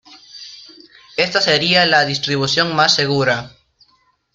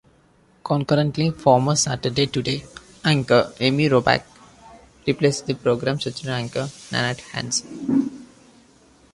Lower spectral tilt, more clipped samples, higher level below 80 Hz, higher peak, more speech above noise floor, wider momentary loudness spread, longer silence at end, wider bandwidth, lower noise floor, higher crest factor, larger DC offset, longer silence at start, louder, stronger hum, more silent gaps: about the same, -3.5 dB/octave vs -4.5 dB/octave; neither; about the same, -56 dBFS vs -54 dBFS; about the same, 0 dBFS vs -2 dBFS; first, 44 dB vs 36 dB; first, 22 LU vs 10 LU; about the same, 0.85 s vs 0.9 s; about the same, 12 kHz vs 11.5 kHz; about the same, -60 dBFS vs -57 dBFS; about the same, 18 dB vs 20 dB; neither; second, 0.1 s vs 0.65 s; first, -15 LUFS vs -21 LUFS; neither; neither